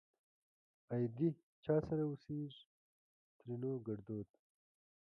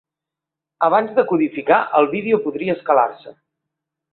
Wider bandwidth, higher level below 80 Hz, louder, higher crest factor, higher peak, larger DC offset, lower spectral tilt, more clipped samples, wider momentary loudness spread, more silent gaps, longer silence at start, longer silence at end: first, 5.8 kHz vs 4.4 kHz; second, -72 dBFS vs -66 dBFS; second, -42 LUFS vs -18 LUFS; about the same, 20 dB vs 18 dB; second, -24 dBFS vs -2 dBFS; neither; about the same, -10.5 dB/octave vs -10.5 dB/octave; neither; first, 13 LU vs 6 LU; first, 1.43-1.63 s, 2.66-3.40 s vs none; about the same, 0.9 s vs 0.8 s; about the same, 0.8 s vs 0.8 s